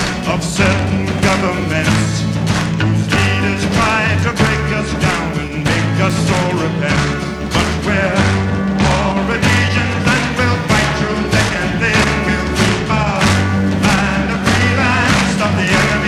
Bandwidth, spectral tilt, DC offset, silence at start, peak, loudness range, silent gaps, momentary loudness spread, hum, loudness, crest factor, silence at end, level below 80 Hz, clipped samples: 14 kHz; -5 dB/octave; under 0.1%; 0 s; 0 dBFS; 2 LU; none; 4 LU; none; -14 LUFS; 14 dB; 0 s; -30 dBFS; under 0.1%